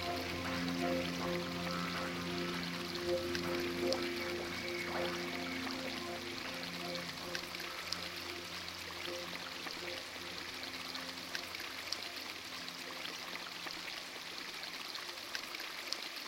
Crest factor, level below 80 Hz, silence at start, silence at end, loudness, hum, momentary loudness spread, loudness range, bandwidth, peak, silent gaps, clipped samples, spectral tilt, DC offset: 26 dB; -66 dBFS; 0 s; 0 s; -40 LUFS; none; 6 LU; 4 LU; 16 kHz; -16 dBFS; none; under 0.1%; -3.5 dB/octave; under 0.1%